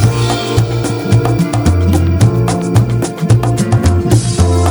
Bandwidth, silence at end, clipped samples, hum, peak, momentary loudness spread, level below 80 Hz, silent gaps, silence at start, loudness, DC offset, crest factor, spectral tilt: over 20 kHz; 0 s; under 0.1%; none; 0 dBFS; 3 LU; -24 dBFS; none; 0 s; -12 LUFS; under 0.1%; 10 dB; -6.5 dB/octave